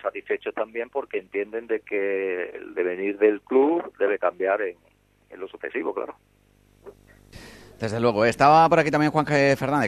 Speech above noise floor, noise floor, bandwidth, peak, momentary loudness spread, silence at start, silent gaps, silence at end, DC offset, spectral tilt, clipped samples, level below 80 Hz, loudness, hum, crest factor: 36 dB; -59 dBFS; 13.5 kHz; -4 dBFS; 14 LU; 0.05 s; none; 0 s; under 0.1%; -6.5 dB/octave; under 0.1%; -58 dBFS; -23 LUFS; 50 Hz at -65 dBFS; 20 dB